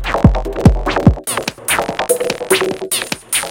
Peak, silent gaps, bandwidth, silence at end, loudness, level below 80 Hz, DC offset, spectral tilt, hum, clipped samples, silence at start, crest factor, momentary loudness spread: 0 dBFS; none; 17.5 kHz; 0 s; -15 LUFS; -22 dBFS; under 0.1%; -4.5 dB/octave; none; 0.5%; 0 s; 14 dB; 5 LU